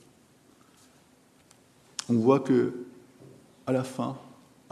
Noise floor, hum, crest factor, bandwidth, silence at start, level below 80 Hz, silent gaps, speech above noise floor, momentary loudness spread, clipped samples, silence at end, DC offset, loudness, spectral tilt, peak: -60 dBFS; none; 22 dB; 13 kHz; 2 s; -76 dBFS; none; 35 dB; 19 LU; under 0.1%; 0.45 s; under 0.1%; -27 LUFS; -6.5 dB/octave; -8 dBFS